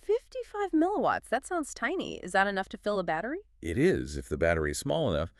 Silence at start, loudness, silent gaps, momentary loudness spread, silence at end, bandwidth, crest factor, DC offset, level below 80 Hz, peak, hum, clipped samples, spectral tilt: 0.1 s; -30 LUFS; none; 8 LU; 0.1 s; 13.5 kHz; 18 dB; under 0.1%; -48 dBFS; -12 dBFS; none; under 0.1%; -5.5 dB/octave